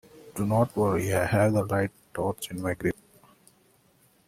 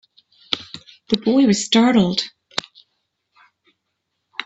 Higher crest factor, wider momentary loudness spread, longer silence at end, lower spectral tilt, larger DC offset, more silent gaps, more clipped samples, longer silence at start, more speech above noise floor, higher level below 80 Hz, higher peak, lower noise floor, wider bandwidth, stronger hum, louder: about the same, 18 dB vs 20 dB; second, 9 LU vs 16 LU; first, 1.35 s vs 0.05 s; first, -6.5 dB/octave vs -4.5 dB/octave; neither; neither; neither; second, 0.15 s vs 0.5 s; second, 37 dB vs 60 dB; about the same, -56 dBFS vs -60 dBFS; second, -10 dBFS vs 0 dBFS; second, -63 dBFS vs -76 dBFS; first, 16 kHz vs 8.4 kHz; neither; second, -27 LUFS vs -18 LUFS